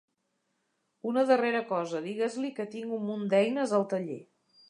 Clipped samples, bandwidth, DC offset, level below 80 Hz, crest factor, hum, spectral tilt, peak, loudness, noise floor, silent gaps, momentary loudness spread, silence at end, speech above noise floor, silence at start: under 0.1%; 11 kHz; under 0.1%; -84 dBFS; 20 dB; none; -6 dB/octave; -12 dBFS; -30 LUFS; -78 dBFS; none; 11 LU; 0.45 s; 49 dB; 1.05 s